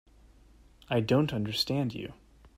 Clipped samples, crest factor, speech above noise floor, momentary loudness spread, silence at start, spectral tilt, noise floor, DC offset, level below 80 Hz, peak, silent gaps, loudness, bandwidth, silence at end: under 0.1%; 18 dB; 29 dB; 12 LU; 0.9 s; -6 dB/octave; -58 dBFS; under 0.1%; -58 dBFS; -14 dBFS; none; -29 LUFS; 16 kHz; 0.1 s